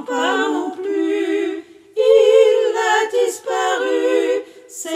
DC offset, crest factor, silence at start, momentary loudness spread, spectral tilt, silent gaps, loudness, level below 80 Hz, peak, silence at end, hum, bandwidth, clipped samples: under 0.1%; 16 dB; 0 s; 13 LU; -1 dB/octave; none; -17 LUFS; -76 dBFS; -2 dBFS; 0 s; none; 15.5 kHz; under 0.1%